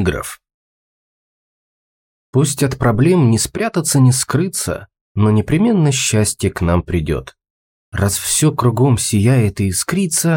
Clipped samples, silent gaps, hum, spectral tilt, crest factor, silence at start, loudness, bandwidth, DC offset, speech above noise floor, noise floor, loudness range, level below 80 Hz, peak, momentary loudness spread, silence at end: under 0.1%; 0.54-2.33 s, 5.01-5.15 s, 7.50-7.92 s; none; -5 dB/octave; 14 dB; 0 s; -15 LUFS; 17 kHz; under 0.1%; over 75 dB; under -90 dBFS; 3 LU; -38 dBFS; -2 dBFS; 8 LU; 0 s